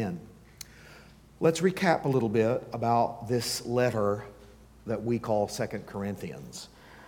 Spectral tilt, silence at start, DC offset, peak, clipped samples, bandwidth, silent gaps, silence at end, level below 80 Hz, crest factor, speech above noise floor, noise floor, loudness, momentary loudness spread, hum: -5.5 dB/octave; 0 s; under 0.1%; -10 dBFS; under 0.1%; 18.5 kHz; none; 0 s; -58 dBFS; 20 dB; 24 dB; -53 dBFS; -29 LUFS; 20 LU; none